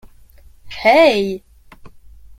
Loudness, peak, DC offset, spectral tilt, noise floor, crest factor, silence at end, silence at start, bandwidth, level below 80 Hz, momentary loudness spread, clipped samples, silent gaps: -14 LUFS; -2 dBFS; under 0.1%; -4.5 dB/octave; -44 dBFS; 18 dB; 0.5 s; 0.65 s; 16 kHz; -46 dBFS; 21 LU; under 0.1%; none